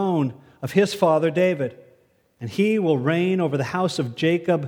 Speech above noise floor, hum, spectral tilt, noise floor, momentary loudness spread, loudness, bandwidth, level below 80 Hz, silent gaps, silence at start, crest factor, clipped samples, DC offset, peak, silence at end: 39 dB; none; -6.5 dB/octave; -60 dBFS; 10 LU; -22 LUFS; 18.5 kHz; -66 dBFS; none; 0 s; 18 dB; under 0.1%; under 0.1%; -4 dBFS; 0 s